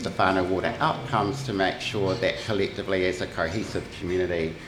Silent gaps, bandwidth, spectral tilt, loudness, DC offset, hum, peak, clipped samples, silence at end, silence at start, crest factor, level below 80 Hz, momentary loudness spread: none; 14.5 kHz; -5.5 dB/octave; -26 LUFS; under 0.1%; none; -6 dBFS; under 0.1%; 0 s; 0 s; 20 dB; -50 dBFS; 5 LU